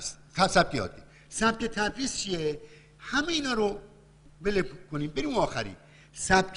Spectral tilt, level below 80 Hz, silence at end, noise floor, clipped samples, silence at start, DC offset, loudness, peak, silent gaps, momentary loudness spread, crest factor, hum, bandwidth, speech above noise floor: -3.5 dB/octave; -48 dBFS; 0 s; -54 dBFS; under 0.1%; 0 s; under 0.1%; -29 LUFS; -8 dBFS; none; 14 LU; 22 dB; none; 11 kHz; 26 dB